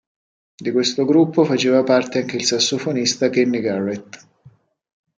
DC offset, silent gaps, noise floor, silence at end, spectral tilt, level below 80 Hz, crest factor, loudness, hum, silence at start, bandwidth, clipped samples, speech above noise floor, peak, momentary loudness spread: under 0.1%; none; -51 dBFS; 1 s; -4 dB/octave; -68 dBFS; 16 dB; -18 LUFS; none; 0.6 s; 9.4 kHz; under 0.1%; 33 dB; -2 dBFS; 8 LU